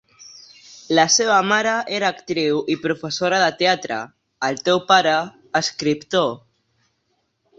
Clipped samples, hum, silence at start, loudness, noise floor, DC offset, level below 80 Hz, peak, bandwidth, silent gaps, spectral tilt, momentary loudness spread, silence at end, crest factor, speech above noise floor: under 0.1%; none; 0.2 s; -19 LUFS; -70 dBFS; under 0.1%; -64 dBFS; -2 dBFS; 8 kHz; none; -2.5 dB/octave; 10 LU; 1.2 s; 18 dB; 50 dB